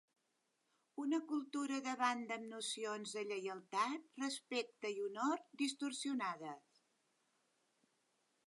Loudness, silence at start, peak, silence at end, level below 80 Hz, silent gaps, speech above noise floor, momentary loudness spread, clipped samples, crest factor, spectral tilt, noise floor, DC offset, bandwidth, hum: -42 LUFS; 0.95 s; -24 dBFS; 1.9 s; under -90 dBFS; none; 42 dB; 7 LU; under 0.1%; 20 dB; -2.5 dB/octave; -84 dBFS; under 0.1%; 11.5 kHz; none